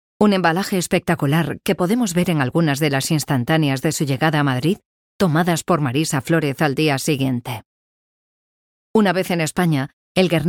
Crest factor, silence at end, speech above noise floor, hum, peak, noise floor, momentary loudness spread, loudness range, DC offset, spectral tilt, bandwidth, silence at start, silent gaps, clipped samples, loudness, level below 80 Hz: 16 dB; 0 s; over 72 dB; none; -2 dBFS; under -90 dBFS; 4 LU; 3 LU; under 0.1%; -5.5 dB/octave; 18 kHz; 0.2 s; 4.85-5.19 s, 7.66-8.94 s, 9.93-10.15 s; under 0.1%; -19 LUFS; -54 dBFS